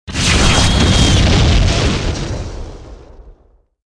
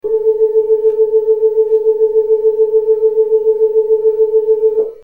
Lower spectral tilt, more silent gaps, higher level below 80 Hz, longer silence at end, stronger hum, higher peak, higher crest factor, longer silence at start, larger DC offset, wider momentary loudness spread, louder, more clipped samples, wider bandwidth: second, -4 dB/octave vs -8 dB/octave; neither; first, -18 dBFS vs -56 dBFS; first, 0.6 s vs 0.1 s; neither; first, 0 dBFS vs -4 dBFS; first, 14 dB vs 8 dB; about the same, 0.05 s vs 0.05 s; neither; first, 16 LU vs 1 LU; about the same, -13 LUFS vs -13 LUFS; neither; first, 10.5 kHz vs 1.3 kHz